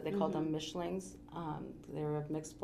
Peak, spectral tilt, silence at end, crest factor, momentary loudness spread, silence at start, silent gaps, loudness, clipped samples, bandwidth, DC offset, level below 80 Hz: -20 dBFS; -6 dB/octave; 0 s; 18 dB; 10 LU; 0 s; none; -40 LUFS; under 0.1%; 14 kHz; under 0.1%; -64 dBFS